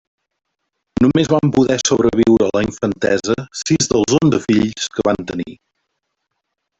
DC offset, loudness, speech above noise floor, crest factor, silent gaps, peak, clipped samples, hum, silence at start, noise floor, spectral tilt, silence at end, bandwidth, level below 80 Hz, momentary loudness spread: under 0.1%; -16 LUFS; 59 dB; 16 dB; none; -2 dBFS; under 0.1%; none; 1 s; -75 dBFS; -5 dB/octave; 1.25 s; 8.4 kHz; -44 dBFS; 8 LU